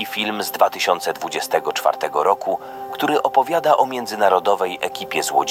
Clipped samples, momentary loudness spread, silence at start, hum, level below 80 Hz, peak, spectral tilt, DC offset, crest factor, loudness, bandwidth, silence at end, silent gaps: under 0.1%; 7 LU; 0 s; none; -68 dBFS; -2 dBFS; -2.5 dB/octave; under 0.1%; 18 dB; -20 LUFS; 17 kHz; 0 s; none